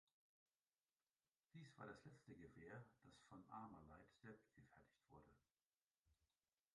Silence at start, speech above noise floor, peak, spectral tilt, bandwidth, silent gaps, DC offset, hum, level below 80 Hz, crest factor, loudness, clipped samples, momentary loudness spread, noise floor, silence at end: 1.55 s; over 26 dB; -44 dBFS; -6.5 dB/octave; 10.5 kHz; 5.62-5.66 s, 5.82-6.04 s; under 0.1%; none; -84 dBFS; 22 dB; -64 LUFS; under 0.1%; 8 LU; under -90 dBFS; 0.5 s